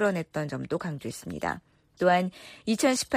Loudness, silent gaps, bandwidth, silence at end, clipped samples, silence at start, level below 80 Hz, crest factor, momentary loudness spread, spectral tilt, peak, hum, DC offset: -29 LUFS; none; 15.5 kHz; 0 s; under 0.1%; 0 s; -60 dBFS; 18 dB; 13 LU; -4.5 dB/octave; -10 dBFS; none; under 0.1%